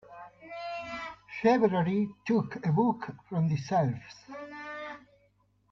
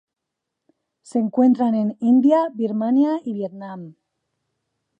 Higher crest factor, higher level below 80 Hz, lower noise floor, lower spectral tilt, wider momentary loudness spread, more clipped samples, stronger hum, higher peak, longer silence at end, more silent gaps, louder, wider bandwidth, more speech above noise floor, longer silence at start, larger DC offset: about the same, 18 dB vs 16 dB; first, -66 dBFS vs -76 dBFS; second, -69 dBFS vs -81 dBFS; about the same, -8 dB/octave vs -8.5 dB/octave; first, 19 LU vs 15 LU; neither; first, 50 Hz at -55 dBFS vs none; second, -12 dBFS vs -6 dBFS; second, 0.75 s vs 1.1 s; neither; second, -30 LUFS vs -19 LUFS; second, 7.2 kHz vs 9.4 kHz; second, 40 dB vs 63 dB; second, 0.1 s vs 1.15 s; neither